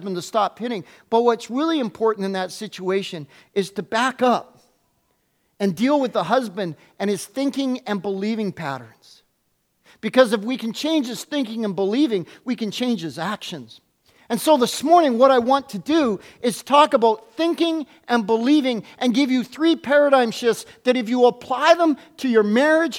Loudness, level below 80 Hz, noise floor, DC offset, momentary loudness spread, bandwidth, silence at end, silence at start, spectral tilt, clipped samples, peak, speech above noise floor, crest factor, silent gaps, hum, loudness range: -20 LUFS; -70 dBFS; -69 dBFS; under 0.1%; 12 LU; 17 kHz; 0 s; 0 s; -4.5 dB/octave; under 0.1%; 0 dBFS; 49 dB; 20 dB; none; none; 7 LU